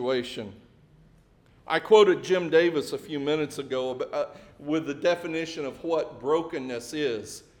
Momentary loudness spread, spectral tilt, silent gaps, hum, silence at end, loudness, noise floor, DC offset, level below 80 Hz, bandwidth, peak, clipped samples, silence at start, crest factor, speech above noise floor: 14 LU; -4.5 dB/octave; none; none; 0.2 s; -26 LUFS; -58 dBFS; under 0.1%; -64 dBFS; 17 kHz; -6 dBFS; under 0.1%; 0 s; 22 dB; 32 dB